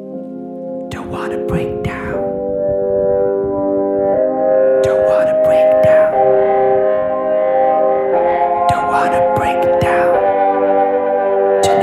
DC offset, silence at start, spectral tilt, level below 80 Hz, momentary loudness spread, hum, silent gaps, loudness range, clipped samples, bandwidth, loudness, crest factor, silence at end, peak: under 0.1%; 0 s; -6.5 dB/octave; -42 dBFS; 10 LU; none; none; 6 LU; under 0.1%; 13 kHz; -14 LUFS; 12 dB; 0 s; -2 dBFS